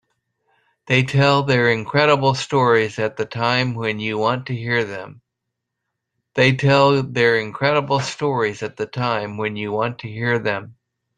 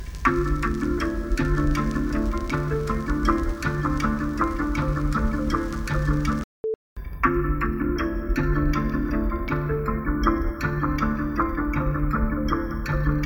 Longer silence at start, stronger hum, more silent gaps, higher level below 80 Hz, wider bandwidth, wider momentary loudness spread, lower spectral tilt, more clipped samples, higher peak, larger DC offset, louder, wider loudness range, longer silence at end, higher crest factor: first, 0.85 s vs 0 s; neither; second, none vs 6.44-6.64 s, 6.75-6.96 s; second, -58 dBFS vs -28 dBFS; second, 9.8 kHz vs 18.5 kHz; first, 10 LU vs 3 LU; second, -5.5 dB/octave vs -7.5 dB/octave; neither; first, -2 dBFS vs -6 dBFS; neither; first, -19 LUFS vs -25 LUFS; first, 5 LU vs 1 LU; first, 0.45 s vs 0 s; about the same, 18 dB vs 18 dB